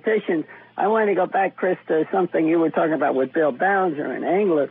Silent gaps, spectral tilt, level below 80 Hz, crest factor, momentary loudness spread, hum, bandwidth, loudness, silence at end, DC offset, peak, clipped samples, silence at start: none; -11 dB/octave; -78 dBFS; 12 dB; 6 LU; none; 3.9 kHz; -21 LUFS; 0 s; under 0.1%; -8 dBFS; under 0.1%; 0.05 s